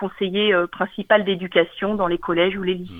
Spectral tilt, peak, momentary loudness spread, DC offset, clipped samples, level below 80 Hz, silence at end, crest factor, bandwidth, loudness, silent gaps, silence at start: -7.5 dB/octave; -2 dBFS; 6 LU; under 0.1%; under 0.1%; -50 dBFS; 0 s; 18 dB; 4.6 kHz; -20 LUFS; none; 0 s